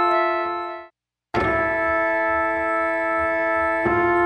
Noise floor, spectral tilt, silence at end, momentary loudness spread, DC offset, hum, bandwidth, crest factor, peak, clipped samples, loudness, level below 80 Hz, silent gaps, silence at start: -54 dBFS; -7 dB/octave; 0 s; 8 LU; under 0.1%; none; 8.8 kHz; 14 dB; -8 dBFS; under 0.1%; -21 LUFS; -46 dBFS; none; 0 s